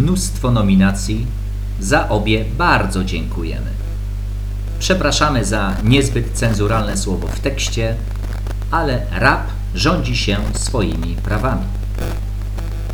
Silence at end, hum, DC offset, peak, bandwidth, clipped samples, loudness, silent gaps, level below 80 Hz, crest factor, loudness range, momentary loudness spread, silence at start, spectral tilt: 0 s; 50 Hz at -20 dBFS; under 0.1%; 0 dBFS; 18 kHz; under 0.1%; -18 LUFS; none; -22 dBFS; 16 dB; 2 LU; 11 LU; 0 s; -5 dB/octave